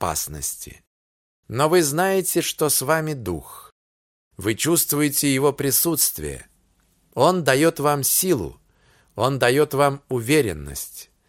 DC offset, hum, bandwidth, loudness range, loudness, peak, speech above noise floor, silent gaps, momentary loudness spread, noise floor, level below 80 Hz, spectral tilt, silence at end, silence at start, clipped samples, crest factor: under 0.1%; none; 17 kHz; 2 LU; -20 LUFS; -2 dBFS; 42 dB; 0.87-1.43 s, 3.72-4.31 s; 15 LU; -63 dBFS; -48 dBFS; -3.5 dB/octave; 0.25 s; 0 s; under 0.1%; 20 dB